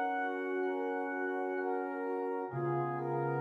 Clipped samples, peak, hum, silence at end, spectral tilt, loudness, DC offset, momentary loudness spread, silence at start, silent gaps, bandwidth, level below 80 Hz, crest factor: under 0.1%; -24 dBFS; none; 0 s; -9 dB/octave; -36 LUFS; under 0.1%; 2 LU; 0 s; none; 4.5 kHz; -82 dBFS; 12 dB